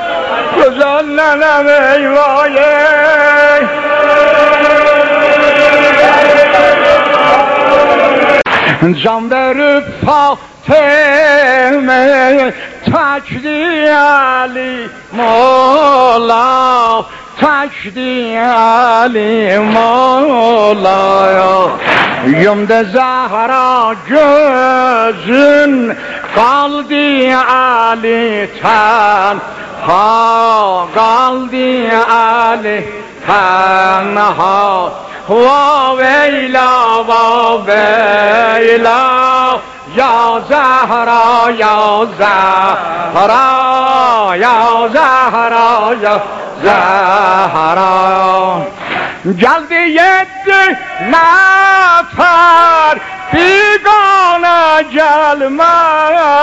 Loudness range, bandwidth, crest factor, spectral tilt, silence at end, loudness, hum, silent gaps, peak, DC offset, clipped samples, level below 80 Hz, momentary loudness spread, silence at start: 3 LU; 8 kHz; 8 dB; -4.5 dB/octave; 0 s; -8 LUFS; none; none; 0 dBFS; under 0.1%; 0.6%; -46 dBFS; 7 LU; 0 s